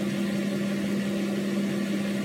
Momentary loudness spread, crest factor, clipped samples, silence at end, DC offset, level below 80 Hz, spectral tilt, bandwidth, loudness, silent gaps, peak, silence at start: 0 LU; 10 dB; under 0.1%; 0 s; under 0.1%; -64 dBFS; -6 dB/octave; 16 kHz; -28 LUFS; none; -16 dBFS; 0 s